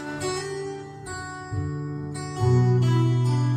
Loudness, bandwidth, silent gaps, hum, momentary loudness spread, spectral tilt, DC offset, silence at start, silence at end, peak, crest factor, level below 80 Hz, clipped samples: -25 LUFS; 10.5 kHz; none; none; 15 LU; -6.5 dB/octave; under 0.1%; 0 s; 0 s; -10 dBFS; 14 dB; -52 dBFS; under 0.1%